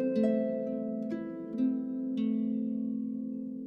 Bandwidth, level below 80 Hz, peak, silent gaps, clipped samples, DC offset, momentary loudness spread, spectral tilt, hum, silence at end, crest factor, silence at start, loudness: 5.6 kHz; -76 dBFS; -18 dBFS; none; under 0.1%; under 0.1%; 8 LU; -9.5 dB/octave; none; 0 s; 14 dB; 0 s; -33 LUFS